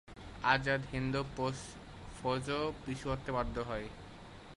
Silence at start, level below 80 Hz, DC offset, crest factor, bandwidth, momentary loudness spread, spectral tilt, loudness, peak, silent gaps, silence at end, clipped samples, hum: 0.05 s; -52 dBFS; under 0.1%; 24 dB; 11.5 kHz; 19 LU; -5.5 dB/octave; -36 LUFS; -12 dBFS; none; 0 s; under 0.1%; none